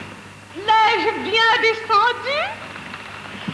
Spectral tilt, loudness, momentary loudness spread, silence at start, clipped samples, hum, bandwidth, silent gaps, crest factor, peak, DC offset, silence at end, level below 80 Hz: -3 dB/octave; -17 LUFS; 18 LU; 0 s; under 0.1%; 50 Hz at -50 dBFS; 11 kHz; none; 14 dB; -6 dBFS; under 0.1%; 0 s; -58 dBFS